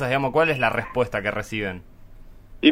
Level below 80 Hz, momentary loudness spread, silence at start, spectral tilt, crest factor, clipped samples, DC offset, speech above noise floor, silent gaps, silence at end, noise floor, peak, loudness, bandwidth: -46 dBFS; 9 LU; 0 s; -6 dB/octave; 22 dB; under 0.1%; under 0.1%; 20 dB; none; 0 s; -43 dBFS; -2 dBFS; -23 LUFS; 16 kHz